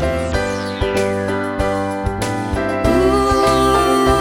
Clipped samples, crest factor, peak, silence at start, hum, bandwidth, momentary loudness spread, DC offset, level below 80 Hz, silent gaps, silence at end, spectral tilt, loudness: under 0.1%; 14 dB; -2 dBFS; 0 s; none; 17.5 kHz; 7 LU; under 0.1%; -28 dBFS; none; 0 s; -5.5 dB/octave; -17 LUFS